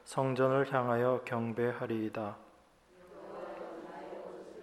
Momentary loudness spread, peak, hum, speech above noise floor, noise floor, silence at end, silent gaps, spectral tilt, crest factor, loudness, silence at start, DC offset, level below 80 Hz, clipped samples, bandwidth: 17 LU; -14 dBFS; none; 30 dB; -63 dBFS; 0 s; none; -7 dB/octave; 20 dB; -34 LUFS; 0.05 s; under 0.1%; -74 dBFS; under 0.1%; 14 kHz